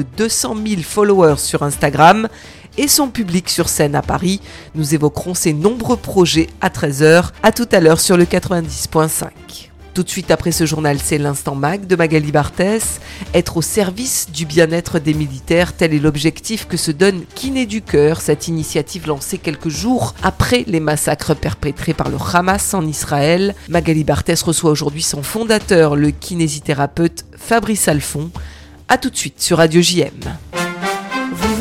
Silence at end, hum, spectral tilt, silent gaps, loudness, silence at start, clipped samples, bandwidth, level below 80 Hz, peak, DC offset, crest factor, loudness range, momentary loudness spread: 0 s; none; -4.5 dB/octave; none; -15 LUFS; 0 s; 0.2%; 16.5 kHz; -36 dBFS; 0 dBFS; under 0.1%; 16 dB; 4 LU; 10 LU